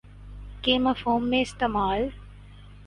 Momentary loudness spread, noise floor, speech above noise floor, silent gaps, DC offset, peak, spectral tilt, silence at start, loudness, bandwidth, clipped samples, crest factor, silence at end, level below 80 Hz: 21 LU; -46 dBFS; 22 dB; none; under 0.1%; -8 dBFS; -5 dB/octave; 0.05 s; -25 LUFS; 11 kHz; under 0.1%; 20 dB; 0 s; -44 dBFS